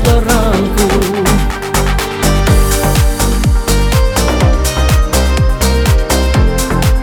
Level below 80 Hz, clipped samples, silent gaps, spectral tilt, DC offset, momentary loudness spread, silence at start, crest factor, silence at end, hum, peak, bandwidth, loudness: -14 dBFS; under 0.1%; none; -5 dB/octave; under 0.1%; 2 LU; 0 s; 10 dB; 0 s; none; 0 dBFS; over 20 kHz; -12 LUFS